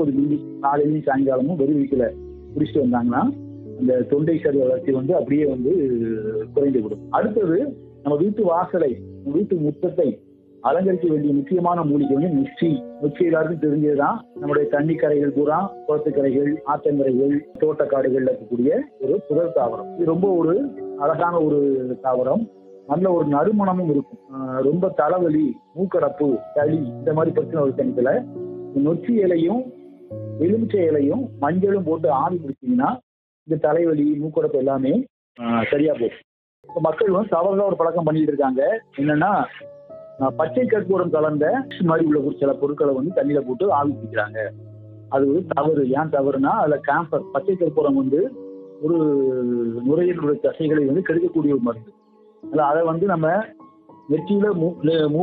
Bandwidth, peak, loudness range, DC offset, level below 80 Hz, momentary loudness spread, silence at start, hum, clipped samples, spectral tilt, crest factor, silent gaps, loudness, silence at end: 4.1 kHz; -6 dBFS; 1 LU; under 0.1%; -58 dBFS; 6 LU; 0 s; none; under 0.1%; -11.5 dB/octave; 14 dB; 33.03-33.46 s, 35.10-35.35 s, 36.24-36.63 s; -21 LUFS; 0 s